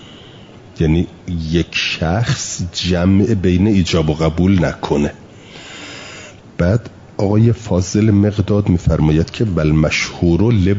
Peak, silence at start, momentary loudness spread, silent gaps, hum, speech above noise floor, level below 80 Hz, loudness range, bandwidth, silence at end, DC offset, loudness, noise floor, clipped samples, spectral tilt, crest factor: -2 dBFS; 0 s; 17 LU; none; none; 24 dB; -34 dBFS; 4 LU; 7.8 kHz; 0 s; under 0.1%; -16 LUFS; -38 dBFS; under 0.1%; -6 dB/octave; 12 dB